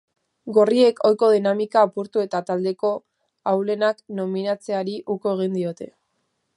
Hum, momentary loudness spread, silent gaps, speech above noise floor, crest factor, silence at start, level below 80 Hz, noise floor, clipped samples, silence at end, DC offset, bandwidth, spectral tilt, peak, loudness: none; 12 LU; none; 52 dB; 18 dB; 0.45 s; -76 dBFS; -73 dBFS; under 0.1%; 0.7 s; under 0.1%; 11 kHz; -6.5 dB/octave; -4 dBFS; -21 LUFS